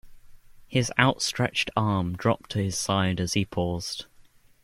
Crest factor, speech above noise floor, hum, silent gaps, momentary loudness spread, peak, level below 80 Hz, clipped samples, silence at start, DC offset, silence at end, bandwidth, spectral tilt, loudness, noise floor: 24 dB; 29 dB; none; none; 7 LU; -4 dBFS; -52 dBFS; under 0.1%; 0.05 s; under 0.1%; 0.4 s; 15.5 kHz; -4.5 dB/octave; -26 LUFS; -55 dBFS